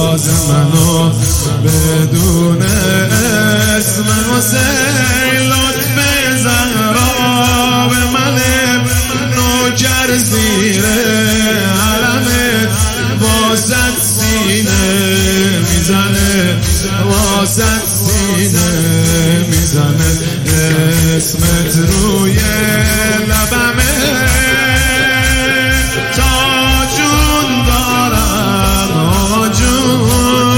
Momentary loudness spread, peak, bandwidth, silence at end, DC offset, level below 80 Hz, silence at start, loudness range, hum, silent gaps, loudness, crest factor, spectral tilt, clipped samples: 2 LU; 0 dBFS; 17 kHz; 0 s; under 0.1%; -22 dBFS; 0 s; 1 LU; none; none; -11 LUFS; 10 dB; -4 dB/octave; under 0.1%